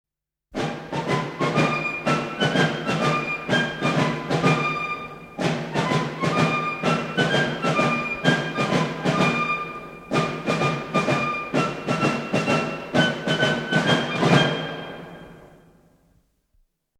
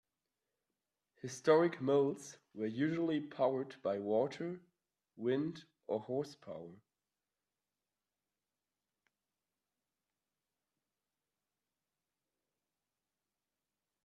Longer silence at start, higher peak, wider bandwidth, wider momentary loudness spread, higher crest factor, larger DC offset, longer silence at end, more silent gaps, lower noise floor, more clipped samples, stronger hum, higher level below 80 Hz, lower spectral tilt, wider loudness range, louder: second, 0.5 s vs 1.25 s; first, -4 dBFS vs -16 dBFS; first, 13.5 kHz vs 12 kHz; second, 8 LU vs 19 LU; about the same, 20 dB vs 24 dB; neither; second, 1.55 s vs 7.3 s; neither; second, -65 dBFS vs under -90 dBFS; neither; second, none vs 50 Hz at -75 dBFS; first, -56 dBFS vs -86 dBFS; about the same, -5.5 dB/octave vs -6.5 dB/octave; second, 2 LU vs 12 LU; first, -23 LUFS vs -36 LUFS